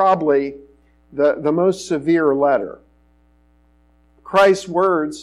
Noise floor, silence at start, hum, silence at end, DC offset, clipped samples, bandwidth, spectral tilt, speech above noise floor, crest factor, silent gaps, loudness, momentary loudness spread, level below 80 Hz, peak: -56 dBFS; 0 s; none; 0 s; under 0.1%; under 0.1%; 12.5 kHz; -5.5 dB/octave; 39 dB; 14 dB; none; -17 LUFS; 7 LU; -56 dBFS; -6 dBFS